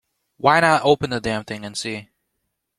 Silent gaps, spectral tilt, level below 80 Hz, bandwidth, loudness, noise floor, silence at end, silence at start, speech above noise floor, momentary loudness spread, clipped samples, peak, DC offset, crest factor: none; -4.5 dB/octave; -54 dBFS; 15 kHz; -20 LUFS; -76 dBFS; 0.75 s; 0.45 s; 57 dB; 14 LU; under 0.1%; -2 dBFS; under 0.1%; 20 dB